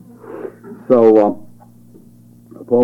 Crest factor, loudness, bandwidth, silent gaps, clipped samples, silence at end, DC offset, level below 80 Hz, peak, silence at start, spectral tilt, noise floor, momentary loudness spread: 16 dB; -13 LUFS; 4.9 kHz; none; under 0.1%; 0 s; under 0.1%; -62 dBFS; -2 dBFS; 0.25 s; -9.5 dB/octave; -44 dBFS; 24 LU